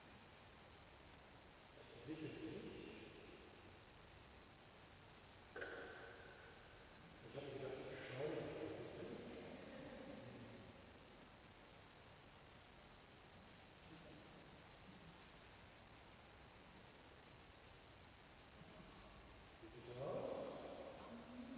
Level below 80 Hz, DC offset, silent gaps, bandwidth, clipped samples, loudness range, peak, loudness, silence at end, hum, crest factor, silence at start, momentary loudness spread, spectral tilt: -72 dBFS; under 0.1%; none; 4 kHz; under 0.1%; 11 LU; -36 dBFS; -57 LUFS; 0 s; none; 20 dB; 0 s; 13 LU; -4.5 dB/octave